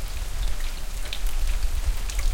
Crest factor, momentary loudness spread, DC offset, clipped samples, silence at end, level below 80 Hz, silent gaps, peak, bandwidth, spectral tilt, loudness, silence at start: 12 dB; 5 LU; under 0.1%; under 0.1%; 0 s; -26 dBFS; none; -10 dBFS; 17 kHz; -3 dB/octave; -32 LUFS; 0 s